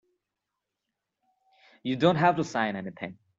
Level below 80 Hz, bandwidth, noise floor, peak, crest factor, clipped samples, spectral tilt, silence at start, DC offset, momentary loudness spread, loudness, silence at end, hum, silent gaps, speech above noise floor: -68 dBFS; 7.8 kHz; -85 dBFS; -8 dBFS; 22 dB; under 0.1%; -6.5 dB/octave; 1.85 s; under 0.1%; 16 LU; -26 LUFS; 0.25 s; none; none; 59 dB